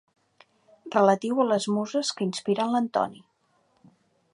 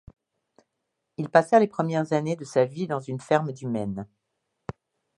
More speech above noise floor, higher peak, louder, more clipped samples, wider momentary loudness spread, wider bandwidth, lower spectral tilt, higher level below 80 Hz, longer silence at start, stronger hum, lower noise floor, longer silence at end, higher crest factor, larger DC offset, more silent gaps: second, 43 dB vs 56 dB; second, -6 dBFS vs -2 dBFS; about the same, -25 LUFS vs -25 LUFS; neither; second, 7 LU vs 21 LU; about the same, 11.5 kHz vs 11.5 kHz; second, -5 dB/octave vs -7 dB/octave; second, -78 dBFS vs -62 dBFS; second, 0.85 s vs 1.2 s; neither; second, -68 dBFS vs -81 dBFS; about the same, 1.15 s vs 1.15 s; about the same, 20 dB vs 24 dB; neither; neither